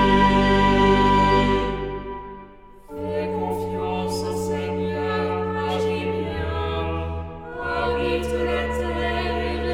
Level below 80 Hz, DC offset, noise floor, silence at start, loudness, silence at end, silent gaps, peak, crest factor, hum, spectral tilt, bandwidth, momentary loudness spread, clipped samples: -34 dBFS; under 0.1%; -44 dBFS; 0 s; -22 LUFS; 0 s; none; -6 dBFS; 16 dB; none; -6.5 dB/octave; 15.5 kHz; 14 LU; under 0.1%